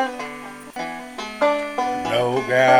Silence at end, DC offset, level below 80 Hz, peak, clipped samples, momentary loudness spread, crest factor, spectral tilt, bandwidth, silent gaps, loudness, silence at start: 0 s; under 0.1%; -58 dBFS; -4 dBFS; under 0.1%; 12 LU; 18 dB; -4.5 dB/octave; 19.5 kHz; none; -23 LUFS; 0 s